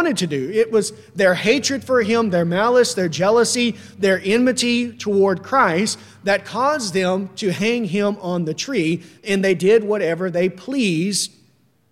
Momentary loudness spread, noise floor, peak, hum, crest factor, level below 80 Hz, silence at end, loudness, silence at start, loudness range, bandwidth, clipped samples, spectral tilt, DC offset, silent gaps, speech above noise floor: 7 LU; -58 dBFS; -2 dBFS; none; 16 dB; -64 dBFS; 0.65 s; -19 LUFS; 0 s; 3 LU; 15.5 kHz; under 0.1%; -4.5 dB/octave; under 0.1%; none; 39 dB